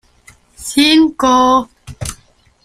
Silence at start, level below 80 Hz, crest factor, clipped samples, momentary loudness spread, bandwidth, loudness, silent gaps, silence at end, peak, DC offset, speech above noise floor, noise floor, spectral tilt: 0.6 s; -42 dBFS; 14 dB; under 0.1%; 17 LU; 15 kHz; -11 LUFS; none; 0.5 s; 0 dBFS; under 0.1%; 39 dB; -50 dBFS; -3.5 dB/octave